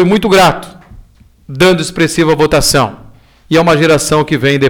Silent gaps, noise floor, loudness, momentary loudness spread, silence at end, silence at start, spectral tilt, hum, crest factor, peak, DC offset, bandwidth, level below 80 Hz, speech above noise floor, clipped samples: none; -41 dBFS; -10 LUFS; 5 LU; 0 s; 0 s; -4.5 dB/octave; none; 10 dB; -2 dBFS; under 0.1%; over 20 kHz; -34 dBFS; 31 dB; under 0.1%